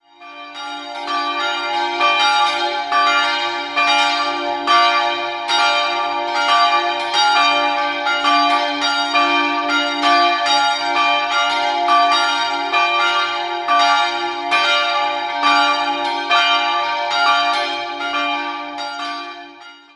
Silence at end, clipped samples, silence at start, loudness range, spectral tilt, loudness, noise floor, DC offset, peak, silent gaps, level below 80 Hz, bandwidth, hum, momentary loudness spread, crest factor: 0.2 s; under 0.1%; 0.2 s; 2 LU; -0.5 dB/octave; -16 LUFS; -40 dBFS; under 0.1%; -2 dBFS; none; -66 dBFS; 11.5 kHz; none; 9 LU; 16 dB